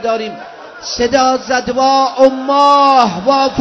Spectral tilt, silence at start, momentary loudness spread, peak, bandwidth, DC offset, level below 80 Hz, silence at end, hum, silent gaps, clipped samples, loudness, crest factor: -3.5 dB/octave; 0 s; 16 LU; 0 dBFS; 8 kHz; under 0.1%; -46 dBFS; 0 s; none; none; 0.5%; -11 LUFS; 12 dB